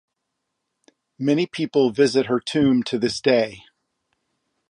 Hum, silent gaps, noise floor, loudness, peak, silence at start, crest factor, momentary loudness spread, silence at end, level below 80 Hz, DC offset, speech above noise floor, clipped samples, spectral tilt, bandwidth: none; none; -78 dBFS; -21 LUFS; -4 dBFS; 1.2 s; 18 dB; 5 LU; 1.1 s; -60 dBFS; under 0.1%; 59 dB; under 0.1%; -5.5 dB/octave; 11 kHz